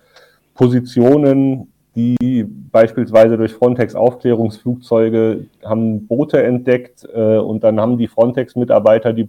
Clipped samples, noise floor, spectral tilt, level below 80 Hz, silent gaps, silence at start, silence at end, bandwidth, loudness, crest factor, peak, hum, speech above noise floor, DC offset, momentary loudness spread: under 0.1%; -49 dBFS; -9 dB/octave; -54 dBFS; none; 0.6 s; 0 s; 9.6 kHz; -14 LUFS; 14 dB; 0 dBFS; none; 36 dB; under 0.1%; 8 LU